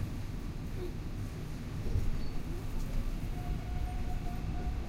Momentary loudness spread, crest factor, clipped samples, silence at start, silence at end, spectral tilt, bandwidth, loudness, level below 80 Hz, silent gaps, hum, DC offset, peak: 5 LU; 16 dB; under 0.1%; 0 s; 0 s; -7 dB/octave; 15.5 kHz; -40 LUFS; -36 dBFS; none; none; under 0.1%; -20 dBFS